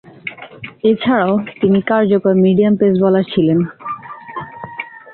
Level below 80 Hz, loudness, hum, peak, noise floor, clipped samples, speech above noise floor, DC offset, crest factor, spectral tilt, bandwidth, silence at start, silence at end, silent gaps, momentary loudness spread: -54 dBFS; -14 LUFS; none; -2 dBFS; -34 dBFS; under 0.1%; 21 dB; under 0.1%; 14 dB; -12 dB/octave; 4.3 kHz; 0.25 s; 0 s; none; 17 LU